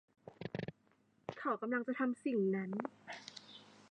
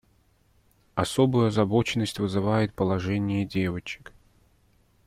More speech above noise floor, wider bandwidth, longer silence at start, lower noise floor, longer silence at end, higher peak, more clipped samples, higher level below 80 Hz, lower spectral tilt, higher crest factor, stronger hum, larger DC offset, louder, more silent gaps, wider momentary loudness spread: about the same, 36 dB vs 39 dB; second, 9.6 kHz vs 15 kHz; second, 0.25 s vs 0.95 s; first, -73 dBFS vs -64 dBFS; second, 0.1 s vs 1.1 s; second, -22 dBFS vs -8 dBFS; neither; second, -80 dBFS vs -54 dBFS; about the same, -7 dB/octave vs -6.5 dB/octave; about the same, 18 dB vs 18 dB; neither; neither; second, -40 LUFS vs -26 LUFS; neither; first, 17 LU vs 11 LU